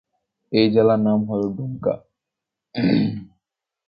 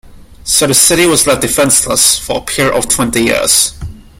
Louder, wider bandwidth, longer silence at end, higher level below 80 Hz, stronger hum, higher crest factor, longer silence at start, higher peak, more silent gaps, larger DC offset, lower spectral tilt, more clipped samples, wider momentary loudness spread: second, -20 LUFS vs -9 LUFS; second, 5.4 kHz vs over 20 kHz; first, 0.6 s vs 0.2 s; second, -56 dBFS vs -34 dBFS; neither; first, 20 dB vs 12 dB; first, 0.5 s vs 0.05 s; about the same, -2 dBFS vs 0 dBFS; neither; neither; first, -10 dB/octave vs -2 dB/octave; second, under 0.1% vs 0.2%; first, 13 LU vs 8 LU